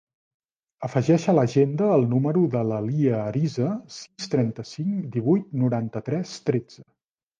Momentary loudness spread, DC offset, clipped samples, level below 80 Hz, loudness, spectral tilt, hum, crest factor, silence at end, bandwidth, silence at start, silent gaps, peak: 9 LU; under 0.1%; under 0.1%; -64 dBFS; -24 LUFS; -8 dB/octave; none; 16 dB; 0.55 s; 9.2 kHz; 0.8 s; none; -8 dBFS